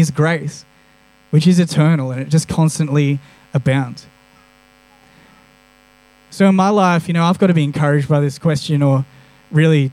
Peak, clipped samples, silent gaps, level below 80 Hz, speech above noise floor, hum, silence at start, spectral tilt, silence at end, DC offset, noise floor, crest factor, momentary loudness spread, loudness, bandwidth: -2 dBFS; under 0.1%; none; -52 dBFS; 37 dB; none; 0 s; -7 dB/octave; 0 s; under 0.1%; -51 dBFS; 14 dB; 10 LU; -15 LUFS; 12.5 kHz